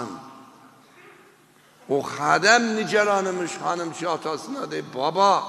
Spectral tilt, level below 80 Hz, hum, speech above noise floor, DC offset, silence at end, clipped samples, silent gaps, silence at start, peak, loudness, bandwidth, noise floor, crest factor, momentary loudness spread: -3 dB/octave; -76 dBFS; none; 33 dB; under 0.1%; 0 s; under 0.1%; none; 0 s; -4 dBFS; -23 LUFS; 13 kHz; -55 dBFS; 22 dB; 13 LU